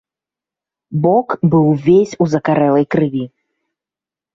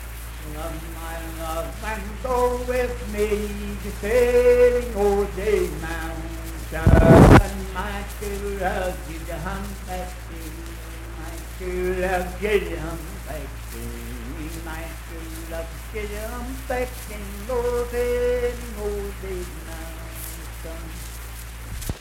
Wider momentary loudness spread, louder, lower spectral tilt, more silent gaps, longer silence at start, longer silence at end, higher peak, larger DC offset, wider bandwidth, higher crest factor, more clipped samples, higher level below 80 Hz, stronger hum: second, 9 LU vs 18 LU; first, -14 LUFS vs -23 LUFS; first, -8.5 dB/octave vs -6.5 dB/octave; neither; first, 0.9 s vs 0 s; first, 1.05 s vs 0 s; about the same, -2 dBFS vs 0 dBFS; neither; second, 7.6 kHz vs 17 kHz; second, 14 dB vs 24 dB; neither; second, -54 dBFS vs -30 dBFS; neither